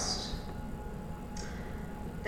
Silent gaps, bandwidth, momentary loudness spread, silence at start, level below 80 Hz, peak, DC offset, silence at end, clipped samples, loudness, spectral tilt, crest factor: none; 17 kHz; 7 LU; 0 s; -44 dBFS; -20 dBFS; under 0.1%; 0 s; under 0.1%; -41 LUFS; -4 dB/octave; 18 dB